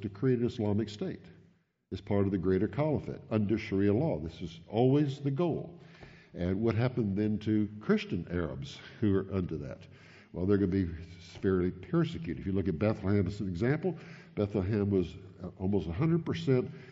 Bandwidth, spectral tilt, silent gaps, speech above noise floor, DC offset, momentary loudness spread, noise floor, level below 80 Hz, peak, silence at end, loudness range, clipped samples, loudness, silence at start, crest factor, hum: 7.6 kHz; -8 dB/octave; none; 35 dB; under 0.1%; 14 LU; -66 dBFS; -56 dBFS; -14 dBFS; 0 s; 2 LU; under 0.1%; -32 LUFS; 0 s; 18 dB; none